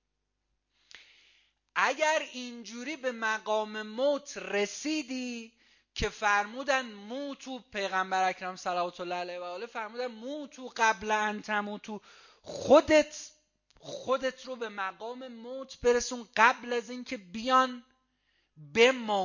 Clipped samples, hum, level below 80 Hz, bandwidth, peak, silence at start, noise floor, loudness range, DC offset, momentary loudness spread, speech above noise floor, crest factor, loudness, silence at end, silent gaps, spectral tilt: under 0.1%; none; -58 dBFS; 7.4 kHz; -6 dBFS; 0.95 s; -82 dBFS; 5 LU; under 0.1%; 17 LU; 51 dB; 24 dB; -30 LUFS; 0 s; none; -3 dB/octave